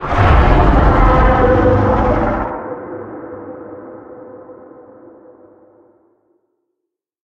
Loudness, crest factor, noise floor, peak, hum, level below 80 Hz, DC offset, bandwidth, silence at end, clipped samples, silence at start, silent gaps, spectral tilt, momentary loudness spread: -13 LUFS; 16 dB; -78 dBFS; 0 dBFS; none; -20 dBFS; under 0.1%; 6.6 kHz; 2.75 s; under 0.1%; 0 s; none; -8.5 dB/octave; 23 LU